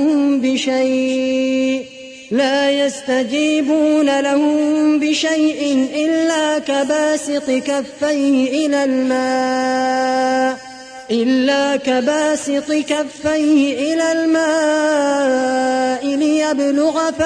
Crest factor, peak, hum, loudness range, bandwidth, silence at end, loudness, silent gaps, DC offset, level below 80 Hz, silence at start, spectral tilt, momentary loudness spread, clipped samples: 12 dB; -4 dBFS; none; 2 LU; 10.5 kHz; 0 s; -16 LUFS; none; under 0.1%; -58 dBFS; 0 s; -3 dB/octave; 4 LU; under 0.1%